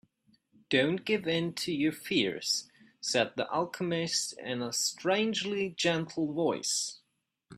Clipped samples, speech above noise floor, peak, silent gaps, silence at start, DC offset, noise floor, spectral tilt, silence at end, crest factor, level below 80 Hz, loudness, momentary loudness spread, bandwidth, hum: under 0.1%; 42 dB; -12 dBFS; none; 0.7 s; under 0.1%; -73 dBFS; -3 dB/octave; 0 s; 20 dB; -72 dBFS; -31 LUFS; 4 LU; 15.5 kHz; none